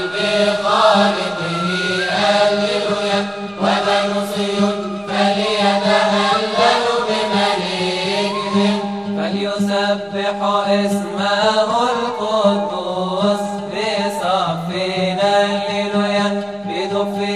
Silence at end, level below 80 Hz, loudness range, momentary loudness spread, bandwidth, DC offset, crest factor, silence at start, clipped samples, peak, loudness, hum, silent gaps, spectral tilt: 0 s; -58 dBFS; 2 LU; 7 LU; 13 kHz; 0.2%; 16 dB; 0 s; under 0.1%; 0 dBFS; -17 LUFS; none; none; -4.5 dB/octave